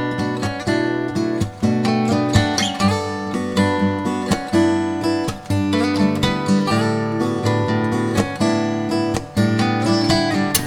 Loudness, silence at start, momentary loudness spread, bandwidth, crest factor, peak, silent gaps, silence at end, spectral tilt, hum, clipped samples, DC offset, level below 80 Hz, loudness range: -19 LUFS; 0 s; 5 LU; over 20 kHz; 18 dB; 0 dBFS; none; 0 s; -5.5 dB/octave; none; under 0.1%; under 0.1%; -44 dBFS; 1 LU